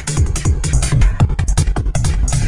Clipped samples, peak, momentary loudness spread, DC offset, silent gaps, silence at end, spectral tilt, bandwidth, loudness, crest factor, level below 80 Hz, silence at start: under 0.1%; 0 dBFS; 3 LU; 2%; none; 0 s; -5 dB/octave; 11.5 kHz; -17 LUFS; 14 dB; -16 dBFS; 0 s